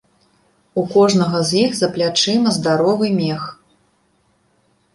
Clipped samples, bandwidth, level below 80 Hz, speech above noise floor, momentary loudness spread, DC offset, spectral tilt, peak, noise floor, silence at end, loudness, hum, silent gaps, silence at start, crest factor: under 0.1%; 11.5 kHz; -58 dBFS; 45 dB; 9 LU; under 0.1%; -5 dB/octave; -2 dBFS; -61 dBFS; 1.4 s; -17 LUFS; none; none; 0.75 s; 16 dB